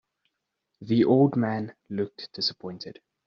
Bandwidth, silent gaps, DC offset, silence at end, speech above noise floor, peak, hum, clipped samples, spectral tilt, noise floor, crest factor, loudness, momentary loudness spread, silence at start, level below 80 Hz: 7.4 kHz; none; under 0.1%; 0.35 s; 56 dB; -10 dBFS; none; under 0.1%; -5.5 dB/octave; -81 dBFS; 18 dB; -25 LUFS; 18 LU; 0.8 s; -68 dBFS